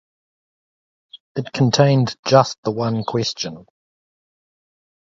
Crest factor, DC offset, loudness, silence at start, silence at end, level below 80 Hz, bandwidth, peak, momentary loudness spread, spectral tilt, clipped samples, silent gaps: 20 dB; under 0.1%; -18 LUFS; 1.15 s; 1.45 s; -58 dBFS; 7.8 kHz; 0 dBFS; 13 LU; -5.5 dB/octave; under 0.1%; 1.20-1.35 s, 2.19-2.23 s, 2.58-2.63 s